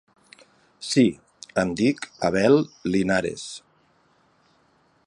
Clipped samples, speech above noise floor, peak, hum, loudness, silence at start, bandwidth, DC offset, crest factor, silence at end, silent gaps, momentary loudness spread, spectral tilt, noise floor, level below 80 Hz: under 0.1%; 41 dB; -6 dBFS; none; -23 LUFS; 0.8 s; 11.5 kHz; under 0.1%; 18 dB; 1.5 s; none; 18 LU; -5.5 dB/octave; -63 dBFS; -56 dBFS